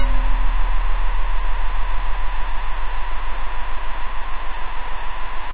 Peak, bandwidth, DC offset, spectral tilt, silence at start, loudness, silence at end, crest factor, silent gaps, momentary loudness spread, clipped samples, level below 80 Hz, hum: -6 dBFS; 4 kHz; 5%; -8 dB/octave; 0 s; -28 LUFS; 0 s; 8 dB; none; 6 LU; under 0.1%; -22 dBFS; none